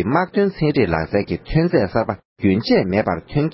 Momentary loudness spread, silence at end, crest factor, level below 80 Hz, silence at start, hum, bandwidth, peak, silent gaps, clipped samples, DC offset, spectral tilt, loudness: 5 LU; 0 s; 16 dB; -38 dBFS; 0 s; none; 5.8 kHz; -2 dBFS; 2.25-2.36 s; under 0.1%; under 0.1%; -11.5 dB/octave; -19 LUFS